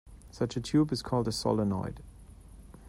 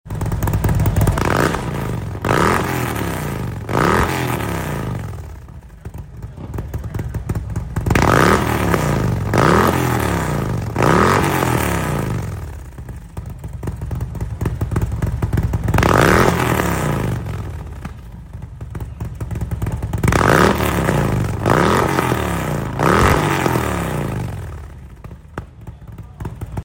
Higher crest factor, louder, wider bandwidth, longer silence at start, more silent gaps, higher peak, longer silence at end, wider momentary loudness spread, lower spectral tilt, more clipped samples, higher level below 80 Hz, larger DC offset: about the same, 18 dB vs 18 dB; second, -31 LUFS vs -18 LUFS; about the same, 15.5 kHz vs 16.5 kHz; about the same, 0.05 s vs 0.05 s; neither; second, -14 dBFS vs 0 dBFS; about the same, 0 s vs 0 s; second, 9 LU vs 20 LU; about the same, -6.5 dB/octave vs -6 dB/octave; neither; second, -52 dBFS vs -30 dBFS; neither